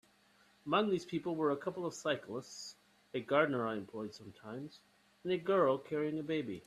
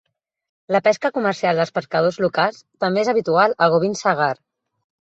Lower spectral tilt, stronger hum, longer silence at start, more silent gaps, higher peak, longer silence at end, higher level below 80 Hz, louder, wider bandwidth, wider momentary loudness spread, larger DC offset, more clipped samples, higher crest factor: about the same, -5.5 dB/octave vs -5 dB/octave; neither; about the same, 0.65 s vs 0.7 s; neither; second, -16 dBFS vs -2 dBFS; second, 0.05 s vs 0.75 s; second, -78 dBFS vs -64 dBFS; second, -36 LUFS vs -19 LUFS; first, 13 kHz vs 8.2 kHz; first, 16 LU vs 6 LU; neither; neither; about the same, 22 dB vs 18 dB